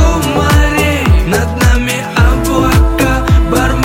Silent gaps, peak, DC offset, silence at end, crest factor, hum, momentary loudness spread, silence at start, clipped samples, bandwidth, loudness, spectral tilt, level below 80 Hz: none; 0 dBFS; under 0.1%; 0 s; 10 dB; none; 2 LU; 0 s; under 0.1%; 17 kHz; -11 LUFS; -5.5 dB/octave; -14 dBFS